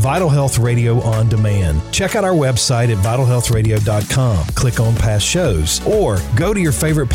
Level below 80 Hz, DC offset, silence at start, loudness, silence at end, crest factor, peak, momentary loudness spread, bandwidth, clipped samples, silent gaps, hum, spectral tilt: -28 dBFS; under 0.1%; 0 s; -15 LUFS; 0 s; 8 dB; -6 dBFS; 2 LU; 16.5 kHz; under 0.1%; none; none; -5 dB/octave